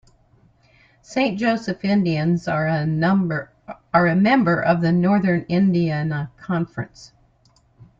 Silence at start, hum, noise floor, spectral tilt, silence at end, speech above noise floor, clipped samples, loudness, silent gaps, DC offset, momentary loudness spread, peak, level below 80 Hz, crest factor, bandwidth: 1.1 s; none; -58 dBFS; -8 dB/octave; 0.95 s; 39 dB; under 0.1%; -20 LUFS; none; under 0.1%; 12 LU; -4 dBFS; -54 dBFS; 18 dB; 7.6 kHz